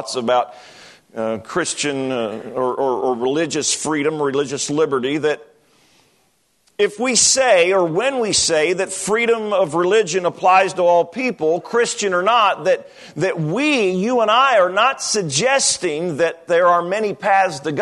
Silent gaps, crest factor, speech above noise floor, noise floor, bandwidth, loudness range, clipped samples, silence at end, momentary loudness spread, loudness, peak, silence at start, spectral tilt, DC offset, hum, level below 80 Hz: none; 16 dB; 44 dB; -62 dBFS; 12.5 kHz; 5 LU; under 0.1%; 0 s; 8 LU; -17 LUFS; -2 dBFS; 0 s; -3 dB/octave; under 0.1%; none; -62 dBFS